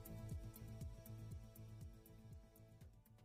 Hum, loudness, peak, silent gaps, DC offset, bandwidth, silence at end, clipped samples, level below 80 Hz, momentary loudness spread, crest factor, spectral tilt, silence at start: none; -57 LUFS; -40 dBFS; none; under 0.1%; 15.5 kHz; 0 s; under 0.1%; -62 dBFS; 12 LU; 14 dB; -6.5 dB/octave; 0 s